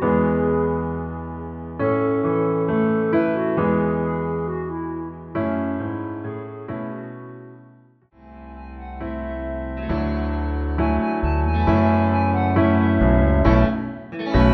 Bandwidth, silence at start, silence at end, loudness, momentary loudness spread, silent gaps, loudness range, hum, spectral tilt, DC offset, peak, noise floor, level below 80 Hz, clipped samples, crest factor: 6 kHz; 0 s; 0 s; -22 LUFS; 15 LU; none; 14 LU; none; -10 dB/octave; under 0.1%; -2 dBFS; -52 dBFS; -30 dBFS; under 0.1%; 18 dB